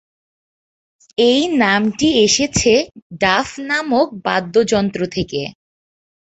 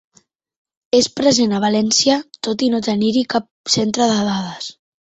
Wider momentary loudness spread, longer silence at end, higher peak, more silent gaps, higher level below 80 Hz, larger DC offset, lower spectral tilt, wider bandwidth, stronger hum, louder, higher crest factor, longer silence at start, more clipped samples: about the same, 9 LU vs 9 LU; first, 0.8 s vs 0.3 s; about the same, -2 dBFS vs -2 dBFS; about the same, 3.02-3.10 s vs 3.51-3.64 s; first, -46 dBFS vs -56 dBFS; neither; about the same, -3.5 dB/octave vs -3.5 dB/octave; about the same, 8.2 kHz vs 8.2 kHz; neither; about the same, -16 LUFS vs -17 LUFS; about the same, 16 dB vs 16 dB; first, 1.2 s vs 0.95 s; neither